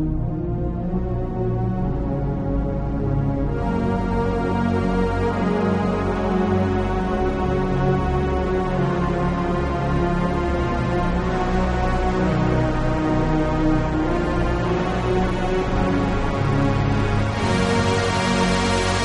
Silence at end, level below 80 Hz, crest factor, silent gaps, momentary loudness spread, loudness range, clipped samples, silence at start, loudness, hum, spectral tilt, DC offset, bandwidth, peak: 0 s; -28 dBFS; 14 dB; none; 4 LU; 2 LU; under 0.1%; 0 s; -22 LUFS; none; -7 dB/octave; under 0.1%; 11.5 kHz; -6 dBFS